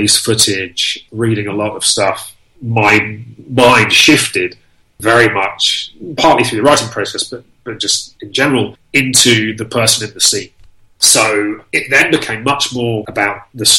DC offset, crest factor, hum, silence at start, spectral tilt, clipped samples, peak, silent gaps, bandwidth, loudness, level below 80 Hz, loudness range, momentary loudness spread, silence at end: under 0.1%; 14 dB; none; 0 s; -2.5 dB/octave; under 0.1%; 0 dBFS; none; over 20 kHz; -12 LUFS; -48 dBFS; 3 LU; 12 LU; 0 s